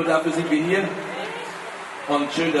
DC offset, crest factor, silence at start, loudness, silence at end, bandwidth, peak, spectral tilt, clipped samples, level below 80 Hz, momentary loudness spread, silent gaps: under 0.1%; 16 dB; 0 s; -24 LUFS; 0 s; 11.5 kHz; -8 dBFS; -5 dB/octave; under 0.1%; -66 dBFS; 12 LU; none